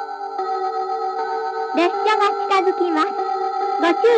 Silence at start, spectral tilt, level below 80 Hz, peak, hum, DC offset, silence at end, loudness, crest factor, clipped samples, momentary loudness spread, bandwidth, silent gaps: 0 s; -2.5 dB/octave; -80 dBFS; -4 dBFS; none; under 0.1%; 0 s; -20 LUFS; 16 dB; under 0.1%; 7 LU; 9.4 kHz; none